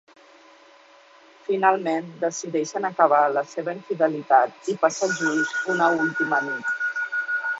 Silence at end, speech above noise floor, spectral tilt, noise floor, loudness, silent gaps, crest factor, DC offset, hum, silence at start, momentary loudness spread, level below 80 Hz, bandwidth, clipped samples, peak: 0 s; 29 dB; -4 dB/octave; -52 dBFS; -23 LUFS; none; 20 dB; under 0.1%; none; 1.5 s; 9 LU; -76 dBFS; 8 kHz; under 0.1%; -2 dBFS